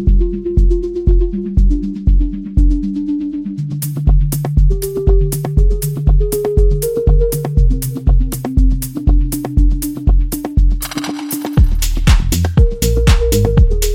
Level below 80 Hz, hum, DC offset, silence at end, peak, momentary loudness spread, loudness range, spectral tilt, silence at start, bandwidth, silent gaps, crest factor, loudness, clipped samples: -14 dBFS; none; 0.1%; 0 s; 0 dBFS; 6 LU; 2 LU; -6.5 dB/octave; 0 s; 17 kHz; none; 12 dB; -16 LUFS; under 0.1%